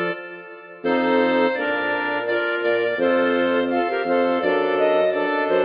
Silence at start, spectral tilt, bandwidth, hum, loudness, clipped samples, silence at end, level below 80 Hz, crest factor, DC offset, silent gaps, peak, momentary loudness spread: 0 s; -7.5 dB/octave; 5.2 kHz; none; -20 LUFS; under 0.1%; 0 s; -66 dBFS; 14 dB; under 0.1%; none; -6 dBFS; 8 LU